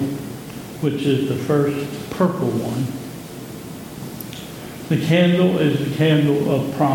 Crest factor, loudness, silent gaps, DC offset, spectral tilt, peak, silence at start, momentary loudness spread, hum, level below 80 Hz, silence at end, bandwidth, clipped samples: 16 dB; -19 LUFS; none; under 0.1%; -7 dB/octave; -4 dBFS; 0 s; 17 LU; none; -54 dBFS; 0 s; 17.5 kHz; under 0.1%